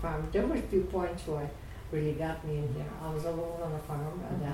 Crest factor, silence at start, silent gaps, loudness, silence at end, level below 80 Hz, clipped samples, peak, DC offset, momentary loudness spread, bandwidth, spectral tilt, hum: 16 dB; 0 s; none; -34 LUFS; 0 s; -44 dBFS; under 0.1%; -16 dBFS; under 0.1%; 7 LU; 16.5 kHz; -7.5 dB/octave; none